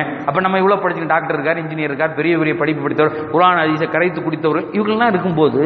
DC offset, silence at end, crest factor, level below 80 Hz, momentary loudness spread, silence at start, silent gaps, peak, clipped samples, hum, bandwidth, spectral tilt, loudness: under 0.1%; 0 s; 16 dB; -56 dBFS; 5 LU; 0 s; none; 0 dBFS; under 0.1%; none; 5 kHz; -9 dB/octave; -16 LUFS